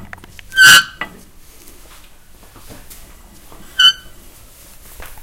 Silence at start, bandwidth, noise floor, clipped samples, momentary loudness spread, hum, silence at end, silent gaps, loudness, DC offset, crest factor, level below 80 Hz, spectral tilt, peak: 0.5 s; 17 kHz; -41 dBFS; 0.3%; 23 LU; none; 0.2 s; none; -8 LUFS; under 0.1%; 18 dB; -42 dBFS; 1.5 dB/octave; 0 dBFS